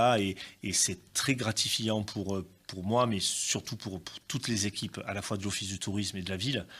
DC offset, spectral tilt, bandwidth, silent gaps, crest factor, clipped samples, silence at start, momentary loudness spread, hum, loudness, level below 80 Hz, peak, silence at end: under 0.1%; -3.5 dB/octave; 16 kHz; none; 18 dB; under 0.1%; 0 s; 11 LU; none; -31 LUFS; -66 dBFS; -14 dBFS; 0 s